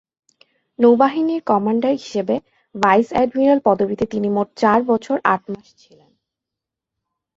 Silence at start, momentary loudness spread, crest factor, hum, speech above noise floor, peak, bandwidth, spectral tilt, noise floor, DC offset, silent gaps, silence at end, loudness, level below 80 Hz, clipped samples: 0.8 s; 8 LU; 18 dB; none; 67 dB; -2 dBFS; 7.8 kHz; -6.5 dB/octave; -85 dBFS; under 0.1%; none; 1.8 s; -18 LUFS; -58 dBFS; under 0.1%